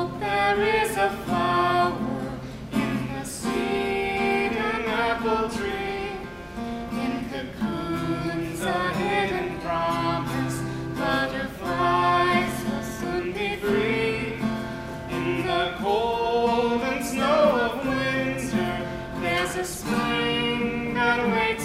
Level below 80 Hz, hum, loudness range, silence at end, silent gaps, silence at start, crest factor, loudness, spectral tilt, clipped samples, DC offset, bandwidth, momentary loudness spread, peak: -46 dBFS; none; 4 LU; 0 s; none; 0 s; 18 dB; -25 LUFS; -5 dB/octave; under 0.1%; under 0.1%; 16 kHz; 9 LU; -8 dBFS